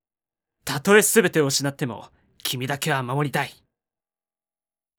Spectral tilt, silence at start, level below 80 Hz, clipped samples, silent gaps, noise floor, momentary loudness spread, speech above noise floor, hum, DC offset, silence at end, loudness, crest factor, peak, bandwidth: -3.5 dB/octave; 0.65 s; -66 dBFS; under 0.1%; none; under -90 dBFS; 15 LU; over 69 dB; none; under 0.1%; 1.45 s; -22 LUFS; 20 dB; -4 dBFS; over 20 kHz